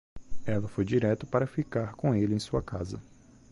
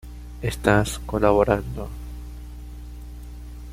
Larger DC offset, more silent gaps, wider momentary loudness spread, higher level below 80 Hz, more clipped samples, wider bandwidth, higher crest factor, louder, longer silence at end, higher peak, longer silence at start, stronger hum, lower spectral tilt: neither; neither; second, 10 LU vs 20 LU; second, -50 dBFS vs -36 dBFS; neither; second, 11.5 kHz vs 16 kHz; second, 16 dB vs 22 dB; second, -30 LUFS vs -22 LUFS; first, 0.5 s vs 0 s; second, -14 dBFS vs -2 dBFS; about the same, 0.15 s vs 0.05 s; second, none vs 60 Hz at -35 dBFS; first, -7.5 dB/octave vs -6 dB/octave